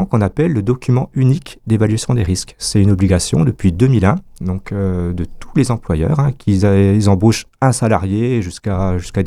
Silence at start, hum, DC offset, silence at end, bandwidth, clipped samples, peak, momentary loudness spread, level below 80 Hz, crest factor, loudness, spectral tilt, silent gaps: 0 s; none; under 0.1%; 0 s; 13 kHz; under 0.1%; 0 dBFS; 8 LU; -32 dBFS; 14 dB; -15 LUFS; -6.5 dB/octave; none